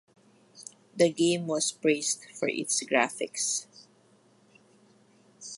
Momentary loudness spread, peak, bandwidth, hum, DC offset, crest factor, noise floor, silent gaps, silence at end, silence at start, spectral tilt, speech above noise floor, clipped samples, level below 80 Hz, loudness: 21 LU; -8 dBFS; 11.5 kHz; none; under 0.1%; 22 dB; -62 dBFS; none; 0 s; 0.55 s; -3 dB/octave; 34 dB; under 0.1%; -80 dBFS; -28 LUFS